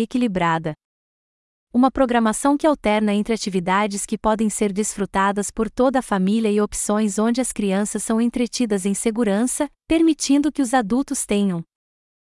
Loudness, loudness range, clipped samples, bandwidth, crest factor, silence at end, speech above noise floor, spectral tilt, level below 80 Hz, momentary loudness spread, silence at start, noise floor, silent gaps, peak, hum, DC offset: -20 LUFS; 1 LU; under 0.1%; 12 kHz; 16 dB; 0.65 s; over 70 dB; -4.5 dB/octave; -46 dBFS; 5 LU; 0 s; under -90 dBFS; 0.85-1.67 s; -4 dBFS; none; under 0.1%